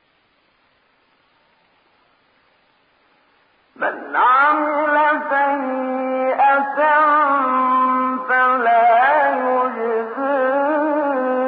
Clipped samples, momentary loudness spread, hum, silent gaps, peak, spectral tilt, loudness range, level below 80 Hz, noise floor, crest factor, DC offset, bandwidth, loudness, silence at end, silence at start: under 0.1%; 8 LU; none; none; -6 dBFS; -8.5 dB/octave; 6 LU; -76 dBFS; -61 dBFS; 14 dB; under 0.1%; 5 kHz; -17 LUFS; 0 s; 3.8 s